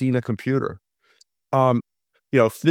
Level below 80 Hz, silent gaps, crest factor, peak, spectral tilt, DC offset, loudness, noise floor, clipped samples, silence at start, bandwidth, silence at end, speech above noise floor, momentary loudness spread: -64 dBFS; none; 18 dB; -4 dBFS; -7.5 dB/octave; under 0.1%; -22 LUFS; -61 dBFS; under 0.1%; 0 s; 16.5 kHz; 0 s; 41 dB; 6 LU